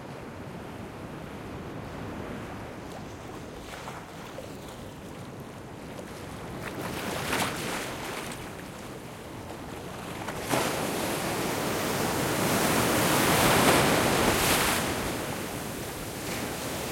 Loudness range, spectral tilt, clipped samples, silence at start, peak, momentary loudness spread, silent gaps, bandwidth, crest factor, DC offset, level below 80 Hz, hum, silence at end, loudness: 17 LU; -3.5 dB/octave; under 0.1%; 0 s; -8 dBFS; 18 LU; none; 16.5 kHz; 22 dB; under 0.1%; -50 dBFS; none; 0 s; -28 LUFS